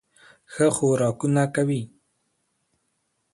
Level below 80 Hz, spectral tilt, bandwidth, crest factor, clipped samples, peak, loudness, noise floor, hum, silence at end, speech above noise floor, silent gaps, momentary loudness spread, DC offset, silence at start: -64 dBFS; -6 dB/octave; 11.5 kHz; 18 dB; under 0.1%; -6 dBFS; -23 LUFS; -74 dBFS; none; 1.5 s; 52 dB; none; 13 LU; under 0.1%; 0.5 s